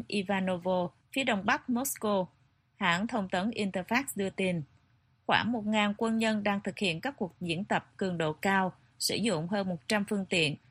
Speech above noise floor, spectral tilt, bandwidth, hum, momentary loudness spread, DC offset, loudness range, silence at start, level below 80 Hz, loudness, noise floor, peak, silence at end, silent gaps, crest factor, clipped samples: 37 dB; -4.5 dB/octave; 15 kHz; none; 6 LU; under 0.1%; 1 LU; 0 s; -66 dBFS; -31 LUFS; -68 dBFS; -8 dBFS; 0.15 s; none; 22 dB; under 0.1%